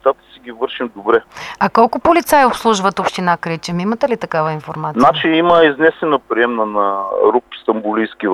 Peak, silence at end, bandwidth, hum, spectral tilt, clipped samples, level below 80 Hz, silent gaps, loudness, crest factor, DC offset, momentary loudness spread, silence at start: 0 dBFS; 0 s; 14 kHz; none; -5 dB/octave; under 0.1%; -50 dBFS; none; -15 LUFS; 14 dB; under 0.1%; 10 LU; 0.05 s